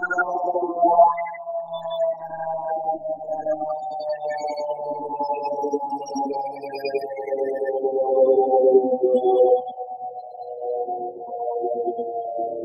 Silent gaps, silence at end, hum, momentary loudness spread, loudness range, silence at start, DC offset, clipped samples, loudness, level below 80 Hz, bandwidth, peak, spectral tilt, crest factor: none; 0 s; none; 13 LU; 7 LU; 0 s; under 0.1%; under 0.1%; -23 LUFS; -76 dBFS; 7.2 kHz; -4 dBFS; -5.5 dB/octave; 18 dB